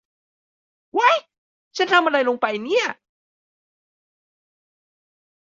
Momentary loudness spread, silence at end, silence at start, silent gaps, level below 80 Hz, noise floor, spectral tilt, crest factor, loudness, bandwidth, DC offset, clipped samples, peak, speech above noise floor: 11 LU; 2.55 s; 0.95 s; 1.38-1.71 s; -78 dBFS; under -90 dBFS; -2.5 dB/octave; 22 dB; -20 LUFS; 7.8 kHz; under 0.1%; under 0.1%; -2 dBFS; over 70 dB